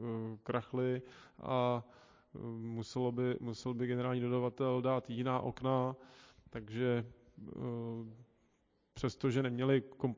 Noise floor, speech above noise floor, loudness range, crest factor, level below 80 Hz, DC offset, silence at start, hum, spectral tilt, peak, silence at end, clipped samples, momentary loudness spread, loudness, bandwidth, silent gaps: -76 dBFS; 39 dB; 4 LU; 18 dB; -68 dBFS; under 0.1%; 0 s; none; -7.5 dB/octave; -20 dBFS; 0 s; under 0.1%; 15 LU; -37 LUFS; 7.6 kHz; none